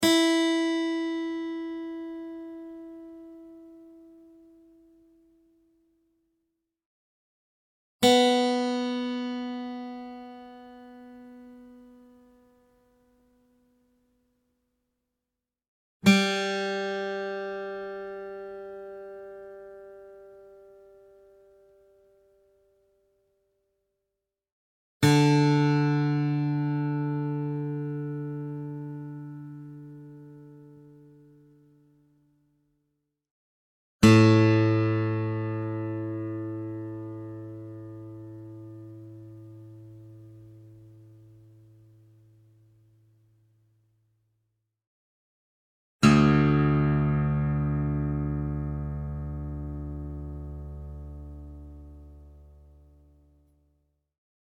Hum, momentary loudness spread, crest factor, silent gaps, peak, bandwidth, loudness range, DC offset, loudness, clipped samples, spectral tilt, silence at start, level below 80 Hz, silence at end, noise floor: none; 26 LU; 26 dB; 6.86-7.99 s, 15.68-16.00 s, 24.52-25.00 s, 33.31-33.99 s, 44.87-45.99 s; -4 dBFS; 16.5 kHz; 23 LU; under 0.1%; -26 LUFS; under 0.1%; -6 dB/octave; 0 s; -48 dBFS; 2.05 s; -88 dBFS